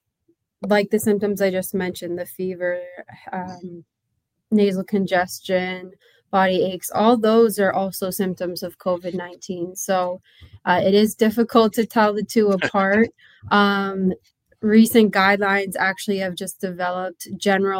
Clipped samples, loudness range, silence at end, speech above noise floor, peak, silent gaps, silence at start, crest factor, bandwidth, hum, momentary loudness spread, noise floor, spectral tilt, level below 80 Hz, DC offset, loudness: under 0.1%; 6 LU; 0 s; 55 dB; -2 dBFS; none; 0.6 s; 18 dB; 16.5 kHz; none; 14 LU; -75 dBFS; -5 dB/octave; -64 dBFS; under 0.1%; -20 LUFS